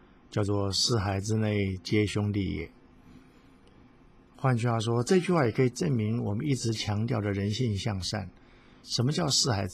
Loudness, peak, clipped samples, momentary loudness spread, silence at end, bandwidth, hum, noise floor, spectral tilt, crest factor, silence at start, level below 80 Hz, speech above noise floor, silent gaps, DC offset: -28 LUFS; -12 dBFS; under 0.1%; 8 LU; 0 s; 14.5 kHz; none; -56 dBFS; -5 dB/octave; 18 dB; 0.3 s; -50 dBFS; 29 dB; none; under 0.1%